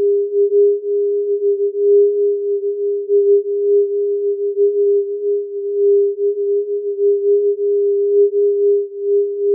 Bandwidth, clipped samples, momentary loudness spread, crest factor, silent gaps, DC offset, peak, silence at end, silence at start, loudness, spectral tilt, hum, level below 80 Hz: 0.6 kHz; under 0.1%; 6 LU; 10 dB; none; under 0.1%; -6 dBFS; 0 s; 0 s; -16 LUFS; -2.5 dB/octave; none; under -90 dBFS